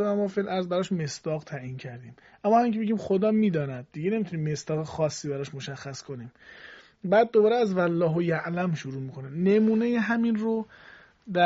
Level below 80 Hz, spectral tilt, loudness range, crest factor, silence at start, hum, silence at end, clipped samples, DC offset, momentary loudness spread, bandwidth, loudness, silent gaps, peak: -66 dBFS; -6 dB/octave; 5 LU; 18 dB; 0 s; none; 0 s; under 0.1%; under 0.1%; 16 LU; 7.6 kHz; -26 LUFS; none; -10 dBFS